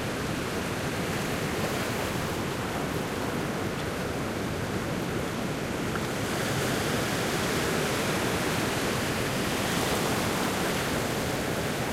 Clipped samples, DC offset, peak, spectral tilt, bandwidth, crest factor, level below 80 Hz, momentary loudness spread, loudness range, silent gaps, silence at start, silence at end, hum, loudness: under 0.1%; under 0.1%; -14 dBFS; -4 dB/octave; 16 kHz; 14 dB; -46 dBFS; 4 LU; 3 LU; none; 0 s; 0 s; none; -29 LUFS